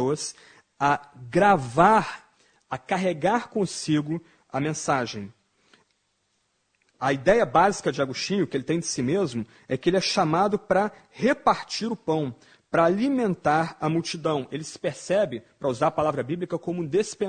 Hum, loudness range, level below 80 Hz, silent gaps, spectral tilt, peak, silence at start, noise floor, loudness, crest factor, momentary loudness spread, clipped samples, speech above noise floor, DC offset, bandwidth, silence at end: none; 4 LU; -58 dBFS; none; -5 dB/octave; -4 dBFS; 0 s; -72 dBFS; -25 LUFS; 22 dB; 12 LU; under 0.1%; 48 dB; under 0.1%; 9.4 kHz; 0 s